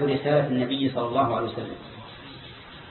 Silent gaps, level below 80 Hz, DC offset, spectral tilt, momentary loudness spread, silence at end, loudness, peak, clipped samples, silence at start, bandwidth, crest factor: none; -56 dBFS; under 0.1%; -11 dB/octave; 19 LU; 0 s; -25 LUFS; -10 dBFS; under 0.1%; 0 s; 4.3 kHz; 16 dB